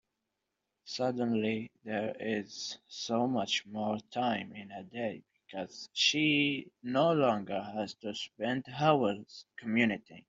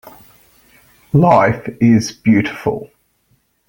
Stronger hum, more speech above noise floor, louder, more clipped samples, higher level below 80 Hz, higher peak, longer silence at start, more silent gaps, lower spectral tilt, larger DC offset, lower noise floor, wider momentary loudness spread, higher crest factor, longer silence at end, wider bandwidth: neither; first, 53 dB vs 48 dB; second, -32 LUFS vs -14 LUFS; neither; second, -74 dBFS vs -48 dBFS; second, -12 dBFS vs 0 dBFS; first, 0.85 s vs 0.05 s; neither; second, -4.5 dB/octave vs -7 dB/octave; neither; first, -86 dBFS vs -61 dBFS; first, 15 LU vs 11 LU; first, 22 dB vs 16 dB; second, 0.1 s vs 0.85 s; second, 7.8 kHz vs 17 kHz